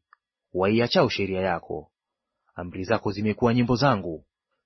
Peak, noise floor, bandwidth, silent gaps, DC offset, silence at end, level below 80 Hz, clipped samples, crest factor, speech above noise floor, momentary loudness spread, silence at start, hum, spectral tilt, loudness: -6 dBFS; -84 dBFS; 6.2 kHz; none; under 0.1%; 0.45 s; -52 dBFS; under 0.1%; 20 dB; 60 dB; 16 LU; 0.55 s; none; -7 dB/octave; -24 LUFS